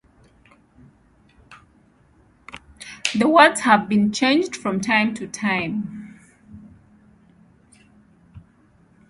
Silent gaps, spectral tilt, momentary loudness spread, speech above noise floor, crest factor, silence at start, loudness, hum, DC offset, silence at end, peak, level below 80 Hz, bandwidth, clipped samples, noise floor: none; -4 dB/octave; 25 LU; 38 dB; 22 dB; 1.5 s; -19 LUFS; none; under 0.1%; 0.7 s; -2 dBFS; -58 dBFS; 11.5 kHz; under 0.1%; -56 dBFS